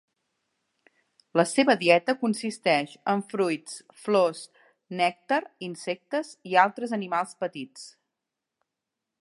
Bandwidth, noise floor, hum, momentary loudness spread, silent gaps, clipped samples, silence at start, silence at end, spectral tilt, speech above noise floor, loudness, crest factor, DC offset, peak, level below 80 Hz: 11.5 kHz; -86 dBFS; none; 17 LU; none; under 0.1%; 1.35 s; 1.3 s; -4.5 dB/octave; 60 dB; -26 LUFS; 24 dB; under 0.1%; -4 dBFS; -82 dBFS